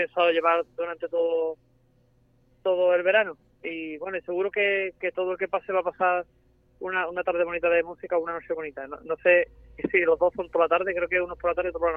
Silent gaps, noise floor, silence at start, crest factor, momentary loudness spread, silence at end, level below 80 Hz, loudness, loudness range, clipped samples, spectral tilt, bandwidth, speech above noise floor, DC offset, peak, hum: none; -63 dBFS; 0 s; 18 dB; 12 LU; 0 s; -58 dBFS; -26 LUFS; 3 LU; under 0.1%; -7 dB/octave; 3.8 kHz; 37 dB; under 0.1%; -8 dBFS; none